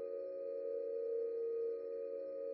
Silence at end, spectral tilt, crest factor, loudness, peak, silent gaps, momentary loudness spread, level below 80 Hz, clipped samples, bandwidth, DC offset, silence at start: 0 s; -5.5 dB/octave; 10 dB; -42 LUFS; -32 dBFS; none; 4 LU; under -90 dBFS; under 0.1%; 4.6 kHz; under 0.1%; 0 s